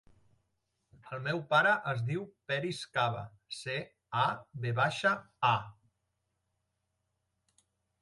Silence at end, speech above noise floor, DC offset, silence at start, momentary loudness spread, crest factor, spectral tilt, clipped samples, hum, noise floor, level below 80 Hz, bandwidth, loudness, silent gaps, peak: 2.3 s; 50 dB; under 0.1%; 1.05 s; 12 LU; 22 dB; -5 dB/octave; under 0.1%; none; -82 dBFS; -70 dBFS; 11.5 kHz; -32 LUFS; none; -14 dBFS